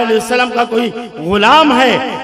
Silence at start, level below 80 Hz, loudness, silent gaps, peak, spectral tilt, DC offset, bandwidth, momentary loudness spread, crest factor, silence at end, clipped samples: 0 s; -44 dBFS; -11 LUFS; none; 0 dBFS; -4 dB/octave; under 0.1%; 15.5 kHz; 10 LU; 12 dB; 0 s; under 0.1%